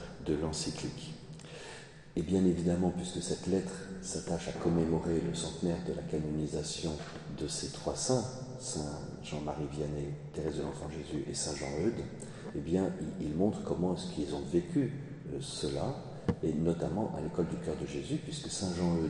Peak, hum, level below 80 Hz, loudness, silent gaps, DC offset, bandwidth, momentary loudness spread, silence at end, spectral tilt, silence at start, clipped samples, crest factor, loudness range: -16 dBFS; none; -54 dBFS; -35 LUFS; none; under 0.1%; 11 kHz; 10 LU; 0 s; -5.5 dB/octave; 0 s; under 0.1%; 20 dB; 3 LU